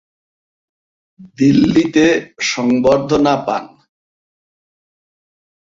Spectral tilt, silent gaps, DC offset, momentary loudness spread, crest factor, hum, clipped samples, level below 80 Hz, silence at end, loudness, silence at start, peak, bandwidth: -5.5 dB/octave; none; under 0.1%; 7 LU; 16 dB; none; under 0.1%; -50 dBFS; 2.1 s; -14 LUFS; 1.2 s; -2 dBFS; 7.6 kHz